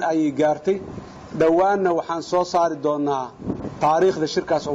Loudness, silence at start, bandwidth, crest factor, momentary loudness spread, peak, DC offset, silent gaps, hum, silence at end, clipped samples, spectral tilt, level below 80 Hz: -21 LUFS; 0 s; 7.8 kHz; 12 dB; 12 LU; -10 dBFS; under 0.1%; none; none; 0 s; under 0.1%; -6 dB/octave; -54 dBFS